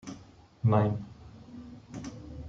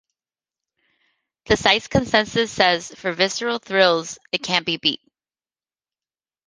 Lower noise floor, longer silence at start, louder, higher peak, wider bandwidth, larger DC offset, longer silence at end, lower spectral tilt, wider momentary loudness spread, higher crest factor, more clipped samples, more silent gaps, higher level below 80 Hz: second, -53 dBFS vs under -90 dBFS; second, 0.05 s vs 1.5 s; second, -29 LUFS vs -20 LUFS; second, -14 dBFS vs 0 dBFS; second, 7.4 kHz vs 10 kHz; neither; second, 0 s vs 1.5 s; first, -8.5 dB/octave vs -3 dB/octave; first, 23 LU vs 8 LU; about the same, 20 dB vs 22 dB; neither; neither; second, -56 dBFS vs -48 dBFS